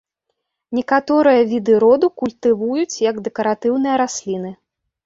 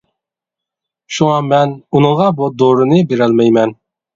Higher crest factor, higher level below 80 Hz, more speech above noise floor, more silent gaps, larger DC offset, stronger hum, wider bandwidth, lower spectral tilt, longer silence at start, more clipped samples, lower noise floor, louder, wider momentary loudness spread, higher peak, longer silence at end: about the same, 16 dB vs 14 dB; second, -62 dBFS vs -54 dBFS; second, 59 dB vs 72 dB; neither; neither; neither; about the same, 7.8 kHz vs 7.8 kHz; second, -5 dB/octave vs -7 dB/octave; second, 0.7 s vs 1.1 s; neither; second, -75 dBFS vs -84 dBFS; second, -17 LUFS vs -12 LUFS; first, 11 LU vs 4 LU; about the same, -2 dBFS vs 0 dBFS; about the same, 0.5 s vs 0.4 s